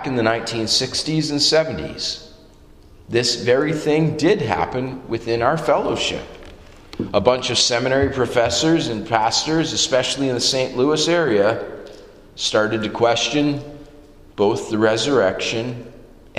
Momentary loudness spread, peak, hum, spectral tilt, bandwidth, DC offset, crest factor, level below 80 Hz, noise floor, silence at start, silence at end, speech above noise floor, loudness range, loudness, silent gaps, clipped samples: 10 LU; 0 dBFS; none; -4 dB/octave; 14.5 kHz; under 0.1%; 20 dB; -46 dBFS; -46 dBFS; 0 s; 0 s; 27 dB; 3 LU; -19 LUFS; none; under 0.1%